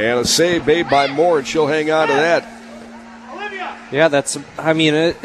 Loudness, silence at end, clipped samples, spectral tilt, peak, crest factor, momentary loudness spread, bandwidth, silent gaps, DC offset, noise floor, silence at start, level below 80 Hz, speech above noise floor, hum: -16 LUFS; 0 s; under 0.1%; -3.5 dB/octave; -2 dBFS; 16 dB; 21 LU; 14 kHz; none; under 0.1%; -36 dBFS; 0 s; -50 dBFS; 21 dB; none